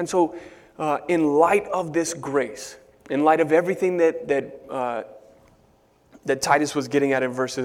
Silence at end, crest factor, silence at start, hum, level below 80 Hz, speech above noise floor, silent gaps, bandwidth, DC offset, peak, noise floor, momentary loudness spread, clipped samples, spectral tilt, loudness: 0 s; 20 dB; 0 s; none; -62 dBFS; 37 dB; none; 16.5 kHz; under 0.1%; -4 dBFS; -59 dBFS; 14 LU; under 0.1%; -4.5 dB/octave; -22 LUFS